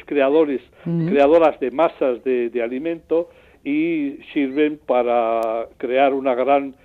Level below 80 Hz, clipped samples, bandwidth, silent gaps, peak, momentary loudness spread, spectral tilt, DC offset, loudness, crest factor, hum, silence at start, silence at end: -58 dBFS; under 0.1%; 6 kHz; none; -4 dBFS; 9 LU; -8.5 dB/octave; under 0.1%; -20 LUFS; 14 dB; none; 0.1 s; 0.15 s